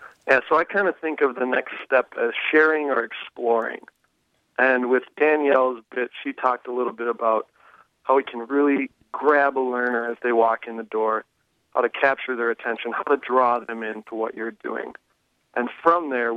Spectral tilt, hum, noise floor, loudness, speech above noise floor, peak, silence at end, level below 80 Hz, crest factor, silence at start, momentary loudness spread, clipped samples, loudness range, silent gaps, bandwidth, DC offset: -6 dB/octave; none; -69 dBFS; -23 LUFS; 47 dB; -4 dBFS; 0 s; -74 dBFS; 18 dB; 0 s; 12 LU; under 0.1%; 3 LU; none; 6.4 kHz; under 0.1%